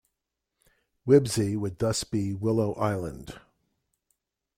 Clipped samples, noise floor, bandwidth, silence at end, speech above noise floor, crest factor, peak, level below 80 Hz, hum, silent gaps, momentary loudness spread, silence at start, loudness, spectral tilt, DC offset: under 0.1%; -84 dBFS; 16 kHz; 1.2 s; 58 dB; 20 dB; -8 dBFS; -56 dBFS; none; none; 17 LU; 1.05 s; -26 LUFS; -6 dB/octave; under 0.1%